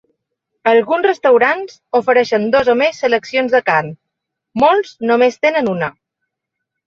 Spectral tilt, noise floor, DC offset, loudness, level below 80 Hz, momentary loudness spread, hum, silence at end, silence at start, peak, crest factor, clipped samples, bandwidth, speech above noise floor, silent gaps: -5.5 dB/octave; -78 dBFS; under 0.1%; -14 LUFS; -56 dBFS; 8 LU; none; 0.95 s; 0.65 s; 0 dBFS; 14 dB; under 0.1%; 7.2 kHz; 64 dB; none